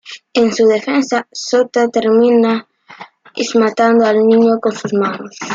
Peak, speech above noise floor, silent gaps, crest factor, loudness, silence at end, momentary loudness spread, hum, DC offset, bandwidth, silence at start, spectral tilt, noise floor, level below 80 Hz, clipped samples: -2 dBFS; 25 dB; none; 12 dB; -13 LUFS; 0 s; 9 LU; none; under 0.1%; 7.6 kHz; 0.05 s; -4.5 dB/octave; -38 dBFS; -62 dBFS; under 0.1%